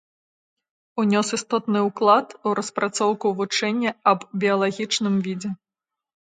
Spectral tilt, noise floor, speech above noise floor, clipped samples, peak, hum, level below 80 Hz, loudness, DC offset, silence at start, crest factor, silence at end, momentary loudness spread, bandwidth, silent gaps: -4.5 dB/octave; -88 dBFS; 66 dB; under 0.1%; -4 dBFS; none; -72 dBFS; -22 LUFS; under 0.1%; 0.95 s; 20 dB; 0.75 s; 7 LU; 9.4 kHz; none